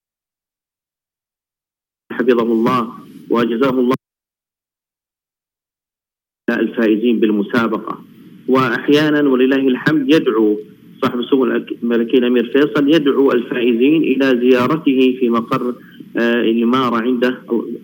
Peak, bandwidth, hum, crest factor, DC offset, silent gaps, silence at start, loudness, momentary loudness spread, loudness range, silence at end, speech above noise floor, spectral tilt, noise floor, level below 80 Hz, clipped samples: 0 dBFS; 17 kHz; none; 16 dB; under 0.1%; none; 2.1 s; -15 LUFS; 8 LU; 7 LU; 0.05 s; over 76 dB; -7 dB/octave; under -90 dBFS; -64 dBFS; under 0.1%